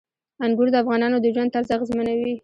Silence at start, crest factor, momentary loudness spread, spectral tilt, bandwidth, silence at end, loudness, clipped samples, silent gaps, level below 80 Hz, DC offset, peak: 0.4 s; 14 dB; 5 LU; -7 dB/octave; 7.6 kHz; 0.05 s; -21 LUFS; under 0.1%; none; -58 dBFS; under 0.1%; -8 dBFS